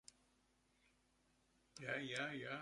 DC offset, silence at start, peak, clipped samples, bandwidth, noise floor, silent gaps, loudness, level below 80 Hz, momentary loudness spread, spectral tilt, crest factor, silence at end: under 0.1%; 1.75 s; -30 dBFS; under 0.1%; 11.5 kHz; -79 dBFS; none; -46 LUFS; -82 dBFS; 20 LU; -4 dB/octave; 22 dB; 0 s